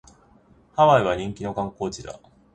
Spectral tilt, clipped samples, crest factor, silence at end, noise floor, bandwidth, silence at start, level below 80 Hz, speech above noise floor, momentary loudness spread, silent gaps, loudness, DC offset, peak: -6 dB/octave; under 0.1%; 20 dB; 0.4 s; -56 dBFS; 9.6 kHz; 0.75 s; -52 dBFS; 34 dB; 18 LU; none; -22 LUFS; under 0.1%; -4 dBFS